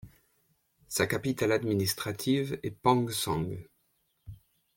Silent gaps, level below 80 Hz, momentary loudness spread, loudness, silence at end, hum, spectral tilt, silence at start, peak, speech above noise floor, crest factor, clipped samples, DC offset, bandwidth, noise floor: none; -60 dBFS; 8 LU; -30 LUFS; 0.4 s; none; -4.5 dB/octave; 0.05 s; -10 dBFS; 45 dB; 22 dB; under 0.1%; under 0.1%; 17 kHz; -74 dBFS